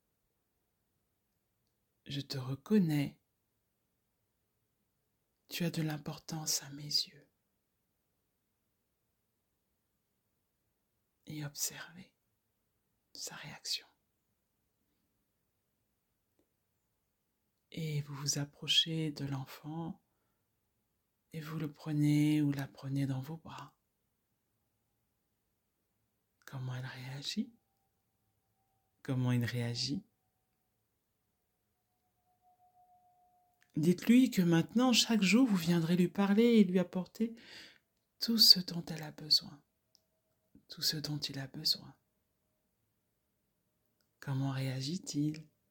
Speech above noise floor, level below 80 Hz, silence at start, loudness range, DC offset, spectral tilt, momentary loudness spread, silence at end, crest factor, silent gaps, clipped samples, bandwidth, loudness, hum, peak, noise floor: 49 dB; -76 dBFS; 2.05 s; 17 LU; under 0.1%; -4.5 dB/octave; 18 LU; 0.3 s; 28 dB; none; under 0.1%; 19 kHz; -32 LUFS; none; -10 dBFS; -82 dBFS